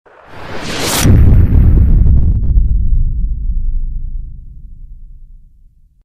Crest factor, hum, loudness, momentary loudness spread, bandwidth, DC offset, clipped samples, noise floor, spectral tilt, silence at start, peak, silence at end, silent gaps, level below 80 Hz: 12 dB; none; -13 LUFS; 19 LU; 16 kHz; under 0.1%; 1%; -44 dBFS; -5.5 dB/octave; 0.3 s; 0 dBFS; 0.8 s; none; -14 dBFS